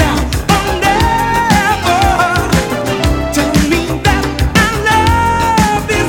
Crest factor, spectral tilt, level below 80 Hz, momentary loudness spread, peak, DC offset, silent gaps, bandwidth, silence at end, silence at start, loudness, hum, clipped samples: 12 dB; -4.5 dB/octave; -22 dBFS; 3 LU; 0 dBFS; under 0.1%; none; 19.5 kHz; 0 s; 0 s; -12 LUFS; none; under 0.1%